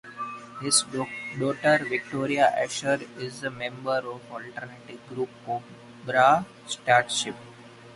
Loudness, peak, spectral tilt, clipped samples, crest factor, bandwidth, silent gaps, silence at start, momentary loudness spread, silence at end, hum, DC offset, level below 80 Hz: -26 LUFS; -6 dBFS; -3 dB/octave; under 0.1%; 22 dB; 11.5 kHz; none; 0.05 s; 17 LU; 0 s; none; under 0.1%; -68 dBFS